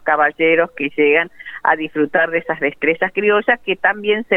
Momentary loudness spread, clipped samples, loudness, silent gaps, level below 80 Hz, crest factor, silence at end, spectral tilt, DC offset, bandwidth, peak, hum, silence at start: 5 LU; under 0.1%; -16 LUFS; none; -60 dBFS; 16 dB; 0 s; -7 dB/octave; under 0.1%; 3.9 kHz; 0 dBFS; none; 0.05 s